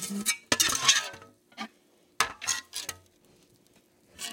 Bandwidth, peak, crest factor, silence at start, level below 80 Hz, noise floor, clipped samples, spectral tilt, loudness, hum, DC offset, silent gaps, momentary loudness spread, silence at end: 17 kHz; -4 dBFS; 28 dB; 0 s; -66 dBFS; -64 dBFS; under 0.1%; 0 dB/octave; -26 LUFS; none; under 0.1%; none; 20 LU; 0 s